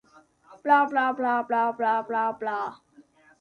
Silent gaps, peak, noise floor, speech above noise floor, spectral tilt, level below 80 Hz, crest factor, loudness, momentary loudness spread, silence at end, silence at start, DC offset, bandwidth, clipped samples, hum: none; -8 dBFS; -56 dBFS; 32 dB; -5.5 dB/octave; -76 dBFS; 18 dB; -25 LUFS; 11 LU; 0.4 s; 0.5 s; under 0.1%; 9.4 kHz; under 0.1%; none